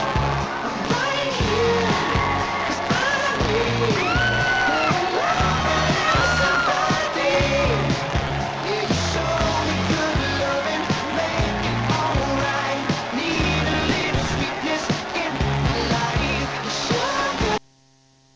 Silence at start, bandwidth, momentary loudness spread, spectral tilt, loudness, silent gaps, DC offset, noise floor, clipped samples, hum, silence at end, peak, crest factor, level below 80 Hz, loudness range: 0 s; 8 kHz; 5 LU; -4.5 dB/octave; -21 LUFS; none; under 0.1%; -56 dBFS; under 0.1%; none; 0.8 s; -8 dBFS; 14 dB; -34 dBFS; 3 LU